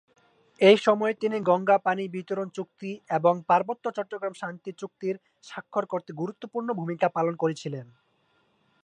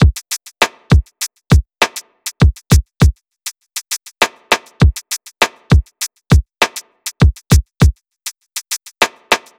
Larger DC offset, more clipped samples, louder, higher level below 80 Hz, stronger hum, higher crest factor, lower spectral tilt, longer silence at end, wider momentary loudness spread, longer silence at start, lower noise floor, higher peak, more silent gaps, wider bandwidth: neither; neither; second, -26 LUFS vs -16 LUFS; second, -80 dBFS vs -20 dBFS; neither; first, 22 dB vs 14 dB; first, -6 dB/octave vs -4.5 dB/octave; first, 1 s vs 0.2 s; about the same, 15 LU vs 14 LU; first, 0.6 s vs 0 s; first, -68 dBFS vs -33 dBFS; second, -6 dBFS vs 0 dBFS; neither; second, 9.8 kHz vs over 20 kHz